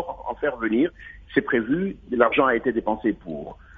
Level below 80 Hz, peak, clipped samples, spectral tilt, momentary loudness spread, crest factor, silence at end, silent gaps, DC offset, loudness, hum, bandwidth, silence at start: -50 dBFS; -4 dBFS; under 0.1%; -9 dB/octave; 13 LU; 20 dB; 0 s; none; under 0.1%; -23 LUFS; none; 3.9 kHz; 0 s